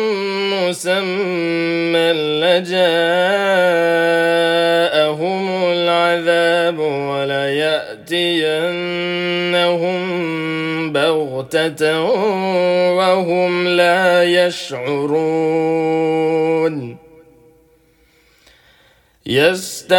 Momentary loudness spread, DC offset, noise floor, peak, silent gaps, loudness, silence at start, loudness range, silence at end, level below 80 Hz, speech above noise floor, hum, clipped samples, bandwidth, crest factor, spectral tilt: 6 LU; under 0.1%; -54 dBFS; 0 dBFS; none; -16 LUFS; 0 s; 5 LU; 0 s; -62 dBFS; 38 dB; none; under 0.1%; 17.5 kHz; 16 dB; -4.5 dB/octave